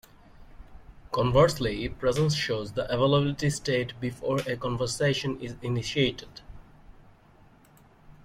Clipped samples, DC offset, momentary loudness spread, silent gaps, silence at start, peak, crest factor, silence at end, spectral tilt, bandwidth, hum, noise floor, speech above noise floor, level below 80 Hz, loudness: under 0.1%; under 0.1%; 10 LU; none; 0.4 s; -8 dBFS; 20 dB; 0.15 s; -5.5 dB/octave; 15.5 kHz; none; -57 dBFS; 30 dB; -48 dBFS; -27 LUFS